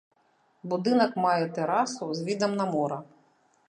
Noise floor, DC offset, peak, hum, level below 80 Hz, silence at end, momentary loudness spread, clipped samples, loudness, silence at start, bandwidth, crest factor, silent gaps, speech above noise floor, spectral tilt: -67 dBFS; under 0.1%; -10 dBFS; none; -78 dBFS; 0.65 s; 9 LU; under 0.1%; -27 LUFS; 0.65 s; 10.5 kHz; 20 dB; none; 40 dB; -5.5 dB/octave